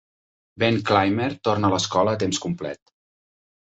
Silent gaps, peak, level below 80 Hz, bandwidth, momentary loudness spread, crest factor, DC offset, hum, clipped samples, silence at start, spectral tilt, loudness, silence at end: none; -4 dBFS; -52 dBFS; 8.4 kHz; 11 LU; 20 dB; under 0.1%; none; under 0.1%; 0.55 s; -5 dB/octave; -22 LUFS; 0.85 s